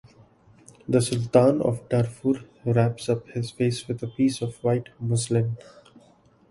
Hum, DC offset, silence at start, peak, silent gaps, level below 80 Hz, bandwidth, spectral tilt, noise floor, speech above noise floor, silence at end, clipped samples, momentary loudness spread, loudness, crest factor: none; under 0.1%; 0.9 s; -4 dBFS; none; -58 dBFS; 11.5 kHz; -6.5 dB/octave; -57 dBFS; 34 dB; 0.95 s; under 0.1%; 10 LU; -25 LUFS; 22 dB